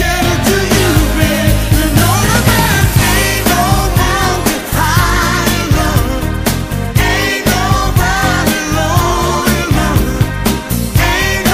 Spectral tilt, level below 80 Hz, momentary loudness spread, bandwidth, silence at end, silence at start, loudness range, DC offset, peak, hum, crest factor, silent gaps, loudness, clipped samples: -4.5 dB/octave; -20 dBFS; 4 LU; 16 kHz; 0 s; 0 s; 2 LU; under 0.1%; 0 dBFS; none; 12 dB; none; -12 LUFS; under 0.1%